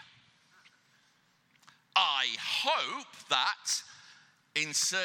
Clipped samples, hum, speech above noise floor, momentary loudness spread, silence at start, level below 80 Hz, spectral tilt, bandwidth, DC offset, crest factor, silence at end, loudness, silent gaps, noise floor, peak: under 0.1%; none; 37 dB; 9 LU; 0 s; under -90 dBFS; 1 dB/octave; 17.5 kHz; under 0.1%; 24 dB; 0 s; -30 LUFS; none; -69 dBFS; -10 dBFS